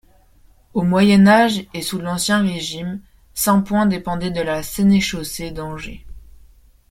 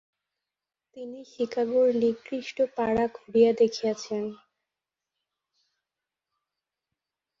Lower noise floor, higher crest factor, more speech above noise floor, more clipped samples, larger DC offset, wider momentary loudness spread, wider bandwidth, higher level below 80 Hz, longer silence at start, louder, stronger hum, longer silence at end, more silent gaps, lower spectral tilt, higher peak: second, -51 dBFS vs -89 dBFS; about the same, 18 dB vs 20 dB; second, 34 dB vs 63 dB; neither; neither; about the same, 17 LU vs 17 LU; first, 16 kHz vs 7.6 kHz; first, -44 dBFS vs -64 dBFS; second, 0.75 s vs 0.95 s; first, -18 LUFS vs -26 LUFS; neither; second, 0.65 s vs 3.05 s; neither; about the same, -5 dB/octave vs -5.5 dB/octave; first, -2 dBFS vs -10 dBFS